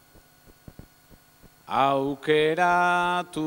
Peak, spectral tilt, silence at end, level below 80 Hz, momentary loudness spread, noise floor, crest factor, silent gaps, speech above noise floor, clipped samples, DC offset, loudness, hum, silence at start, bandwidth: -8 dBFS; -5 dB/octave; 0 s; -58 dBFS; 6 LU; -55 dBFS; 18 dB; none; 32 dB; under 0.1%; under 0.1%; -23 LUFS; none; 1.7 s; 16 kHz